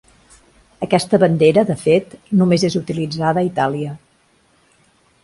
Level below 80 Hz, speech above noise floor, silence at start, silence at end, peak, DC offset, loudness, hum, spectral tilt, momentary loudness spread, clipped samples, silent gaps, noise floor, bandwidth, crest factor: -54 dBFS; 41 dB; 0.8 s; 1.25 s; 0 dBFS; under 0.1%; -17 LUFS; none; -6.5 dB/octave; 12 LU; under 0.1%; none; -57 dBFS; 11.5 kHz; 18 dB